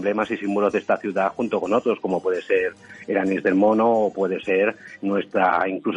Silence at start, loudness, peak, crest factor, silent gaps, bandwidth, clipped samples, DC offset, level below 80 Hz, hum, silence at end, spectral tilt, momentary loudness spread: 0 s; -22 LUFS; -6 dBFS; 16 dB; none; 9.4 kHz; under 0.1%; under 0.1%; -64 dBFS; none; 0 s; -7 dB/octave; 7 LU